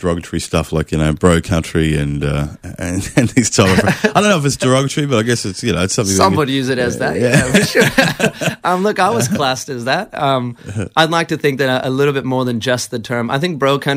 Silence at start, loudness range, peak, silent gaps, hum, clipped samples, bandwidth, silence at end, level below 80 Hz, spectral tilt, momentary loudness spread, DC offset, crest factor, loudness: 0 s; 3 LU; 0 dBFS; none; none; under 0.1%; 16 kHz; 0 s; -36 dBFS; -4.5 dB/octave; 7 LU; under 0.1%; 16 dB; -15 LUFS